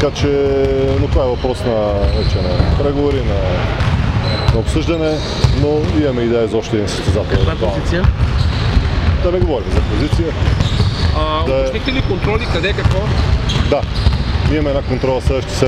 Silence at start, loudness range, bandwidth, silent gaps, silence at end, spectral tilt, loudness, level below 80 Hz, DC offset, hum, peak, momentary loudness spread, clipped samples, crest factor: 0 s; 0 LU; 10.5 kHz; none; 0 s; -6.5 dB/octave; -16 LUFS; -20 dBFS; under 0.1%; none; 0 dBFS; 2 LU; under 0.1%; 14 dB